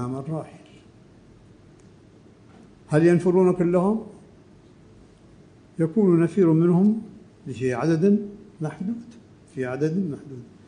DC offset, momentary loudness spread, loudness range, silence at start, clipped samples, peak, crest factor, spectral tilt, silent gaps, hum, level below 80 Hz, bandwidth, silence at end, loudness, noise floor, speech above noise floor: under 0.1%; 21 LU; 4 LU; 0 s; under 0.1%; -6 dBFS; 18 dB; -9 dB/octave; none; none; -60 dBFS; 10 kHz; 0.25 s; -22 LUFS; -51 dBFS; 30 dB